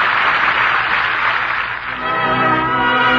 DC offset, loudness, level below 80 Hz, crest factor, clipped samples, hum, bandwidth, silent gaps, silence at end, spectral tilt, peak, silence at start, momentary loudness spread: under 0.1%; -15 LUFS; -44 dBFS; 12 dB; under 0.1%; none; 7.6 kHz; none; 0 s; -5 dB/octave; -4 dBFS; 0 s; 6 LU